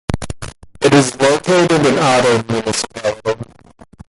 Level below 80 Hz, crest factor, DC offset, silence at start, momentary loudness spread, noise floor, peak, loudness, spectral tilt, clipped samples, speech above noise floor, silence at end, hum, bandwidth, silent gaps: -40 dBFS; 14 dB; under 0.1%; 0.1 s; 16 LU; -44 dBFS; 0 dBFS; -14 LUFS; -4.5 dB/octave; under 0.1%; 30 dB; 0.65 s; none; 11.5 kHz; none